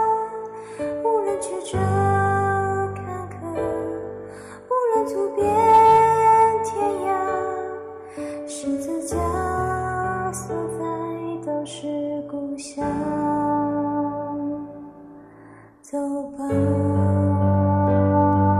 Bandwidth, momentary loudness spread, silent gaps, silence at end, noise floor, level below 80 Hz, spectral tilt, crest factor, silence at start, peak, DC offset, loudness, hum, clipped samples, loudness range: 13.5 kHz; 15 LU; none; 0 s; -46 dBFS; -50 dBFS; -7 dB/octave; 16 dB; 0 s; -6 dBFS; under 0.1%; -22 LUFS; none; under 0.1%; 9 LU